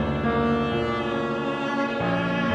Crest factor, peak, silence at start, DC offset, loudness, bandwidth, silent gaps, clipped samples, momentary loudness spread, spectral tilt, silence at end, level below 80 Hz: 14 dB; -10 dBFS; 0 s; under 0.1%; -25 LUFS; 8.6 kHz; none; under 0.1%; 3 LU; -7 dB/octave; 0 s; -44 dBFS